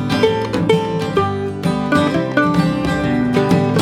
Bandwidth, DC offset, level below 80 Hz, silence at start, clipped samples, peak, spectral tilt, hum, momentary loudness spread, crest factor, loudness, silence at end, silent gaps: 15 kHz; under 0.1%; -40 dBFS; 0 s; under 0.1%; 0 dBFS; -6.5 dB/octave; none; 4 LU; 16 dB; -17 LUFS; 0 s; none